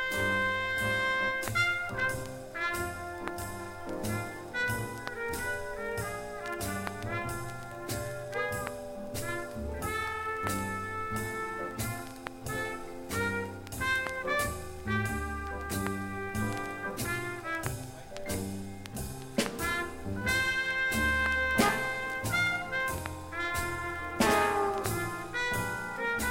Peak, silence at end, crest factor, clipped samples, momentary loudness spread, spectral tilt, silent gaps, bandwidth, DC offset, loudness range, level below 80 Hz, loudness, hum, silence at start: -12 dBFS; 0 s; 22 dB; under 0.1%; 11 LU; -4 dB/octave; none; 16.5 kHz; under 0.1%; 7 LU; -48 dBFS; -32 LUFS; none; 0 s